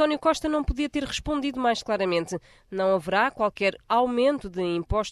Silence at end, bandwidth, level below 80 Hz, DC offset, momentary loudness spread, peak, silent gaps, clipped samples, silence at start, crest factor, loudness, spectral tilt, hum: 0 s; 12.5 kHz; -40 dBFS; under 0.1%; 6 LU; -10 dBFS; none; under 0.1%; 0 s; 16 dB; -25 LUFS; -5 dB/octave; none